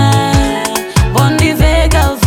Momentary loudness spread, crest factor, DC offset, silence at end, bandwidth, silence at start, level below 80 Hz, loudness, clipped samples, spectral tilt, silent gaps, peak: 4 LU; 10 dB; under 0.1%; 0 s; 19 kHz; 0 s; -16 dBFS; -11 LUFS; under 0.1%; -5 dB/octave; none; 0 dBFS